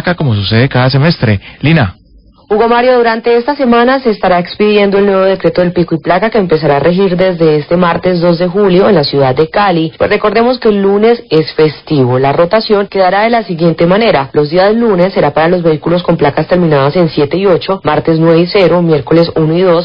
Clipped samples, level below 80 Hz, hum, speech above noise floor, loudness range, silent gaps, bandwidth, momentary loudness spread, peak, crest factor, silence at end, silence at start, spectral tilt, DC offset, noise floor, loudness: 0.2%; -38 dBFS; none; 33 dB; 1 LU; none; 5.4 kHz; 4 LU; 0 dBFS; 8 dB; 0 s; 0 s; -9.5 dB/octave; 0.1%; -42 dBFS; -9 LUFS